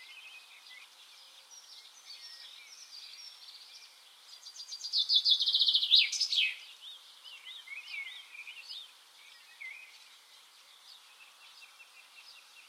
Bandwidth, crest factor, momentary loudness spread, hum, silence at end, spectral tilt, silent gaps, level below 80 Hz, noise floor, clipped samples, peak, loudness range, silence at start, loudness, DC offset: 16 kHz; 26 dB; 28 LU; none; 0.1 s; 6.5 dB/octave; none; under -90 dBFS; -59 dBFS; under 0.1%; -12 dBFS; 22 LU; 0 s; -27 LUFS; under 0.1%